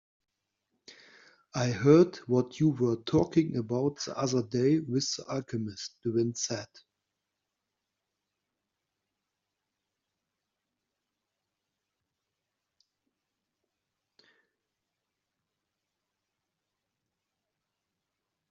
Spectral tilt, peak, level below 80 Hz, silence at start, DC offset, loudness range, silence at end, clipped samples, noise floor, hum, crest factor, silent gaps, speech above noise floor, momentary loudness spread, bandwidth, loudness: -6.5 dB/octave; -10 dBFS; -70 dBFS; 0.9 s; under 0.1%; 10 LU; 11.85 s; under 0.1%; -86 dBFS; none; 24 dB; none; 58 dB; 14 LU; 7.4 kHz; -29 LUFS